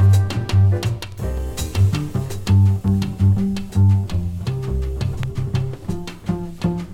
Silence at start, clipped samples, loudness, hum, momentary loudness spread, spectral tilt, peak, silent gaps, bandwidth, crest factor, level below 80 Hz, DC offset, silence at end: 0 s; under 0.1%; -20 LUFS; none; 10 LU; -7 dB/octave; -6 dBFS; none; 13 kHz; 14 dB; -32 dBFS; under 0.1%; 0 s